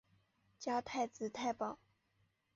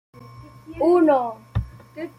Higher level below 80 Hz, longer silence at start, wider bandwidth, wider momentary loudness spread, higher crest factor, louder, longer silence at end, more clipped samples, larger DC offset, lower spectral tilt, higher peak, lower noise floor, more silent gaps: second, -78 dBFS vs -42 dBFS; first, 0.6 s vs 0.25 s; second, 7.6 kHz vs 10.5 kHz; second, 7 LU vs 21 LU; about the same, 18 dB vs 16 dB; second, -41 LUFS vs -20 LUFS; first, 0.8 s vs 0.1 s; neither; neither; second, -3 dB/octave vs -9 dB/octave; second, -26 dBFS vs -6 dBFS; first, -79 dBFS vs -43 dBFS; neither